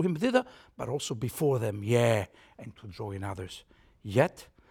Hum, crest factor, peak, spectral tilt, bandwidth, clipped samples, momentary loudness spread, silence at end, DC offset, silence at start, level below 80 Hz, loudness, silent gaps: none; 22 dB; -10 dBFS; -6 dB/octave; 18 kHz; under 0.1%; 20 LU; 0.25 s; under 0.1%; 0 s; -62 dBFS; -30 LUFS; none